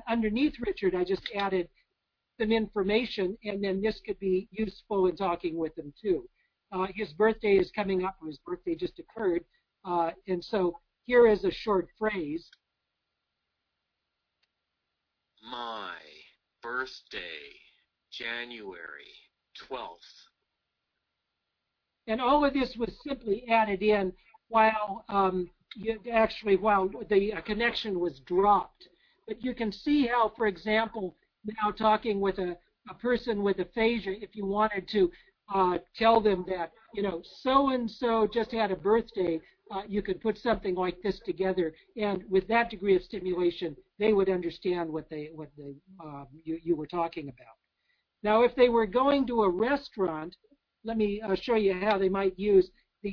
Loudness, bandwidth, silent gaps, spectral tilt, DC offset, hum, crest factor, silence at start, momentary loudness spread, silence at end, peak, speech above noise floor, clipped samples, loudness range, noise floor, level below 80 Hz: -29 LUFS; 5.4 kHz; none; -7.5 dB/octave; under 0.1%; none; 20 dB; 0.05 s; 15 LU; 0 s; -10 dBFS; 55 dB; under 0.1%; 13 LU; -84 dBFS; -56 dBFS